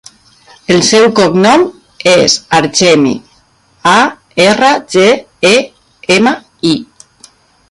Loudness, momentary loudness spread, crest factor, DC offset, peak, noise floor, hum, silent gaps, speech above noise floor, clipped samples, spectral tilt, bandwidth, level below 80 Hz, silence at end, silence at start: -9 LUFS; 8 LU; 10 dB; under 0.1%; 0 dBFS; -49 dBFS; none; none; 41 dB; under 0.1%; -3.5 dB/octave; 11.5 kHz; -50 dBFS; 0.85 s; 0.7 s